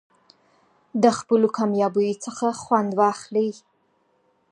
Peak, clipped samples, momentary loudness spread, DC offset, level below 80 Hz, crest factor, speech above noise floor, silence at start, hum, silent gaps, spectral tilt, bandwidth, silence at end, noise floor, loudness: -4 dBFS; under 0.1%; 7 LU; under 0.1%; -70 dBFS; 20 dB; 45 dB; 0.95 s; none; none; -5.5 dB/octave; 11 kHz; 1 s; -66 dBFS; -22 LUFS